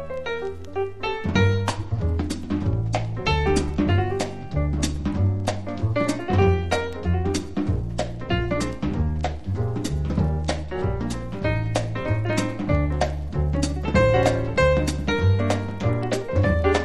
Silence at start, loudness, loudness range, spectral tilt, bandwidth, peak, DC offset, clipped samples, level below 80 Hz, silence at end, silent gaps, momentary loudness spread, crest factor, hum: 0 s; -24 LUFS; 4 LU; -6.5 dB/octave; 12 kHz; -6 dBFS; 1%; under 0.1%; -30 dBFS; 0 s; none; 7 LU; 18 dB; none